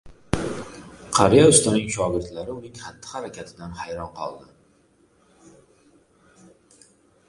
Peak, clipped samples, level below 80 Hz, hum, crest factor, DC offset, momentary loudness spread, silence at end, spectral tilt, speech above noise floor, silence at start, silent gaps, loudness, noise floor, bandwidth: 0 dBFS; under 0.1%; -48 dBFS; none; 24 dB; under 0.1%; 23 LU; 2.9 s; -4 dB/octave; 39 dB; 0.05 s; none; -21 LUFS; -60 dBFS; 11.5 kHz